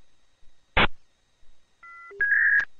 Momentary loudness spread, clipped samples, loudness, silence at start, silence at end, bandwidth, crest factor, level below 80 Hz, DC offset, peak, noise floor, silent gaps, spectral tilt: 23 LU; under 0.1%; -22 LUFS; 0.45 s; 0 s; 7 kHz; 20 dB; -42 dBFS; under 0.1%; -8 dBFS; -52 dBFS; none; -5 dB/octave